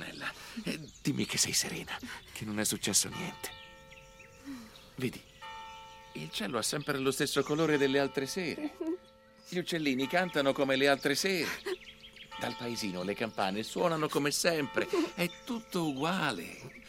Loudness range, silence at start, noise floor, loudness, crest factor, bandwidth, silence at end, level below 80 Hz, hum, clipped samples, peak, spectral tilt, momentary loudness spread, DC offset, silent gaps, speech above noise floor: 5 LU; 0 s; -58 dBFS; -32 LUFS; 22 dB; 16 kHz; 0 s; -64 dBFS; none; under 0.1%; -12 dBFS; -3.5 dB/octave; 19 LU; under 0.1%; none; 26 dB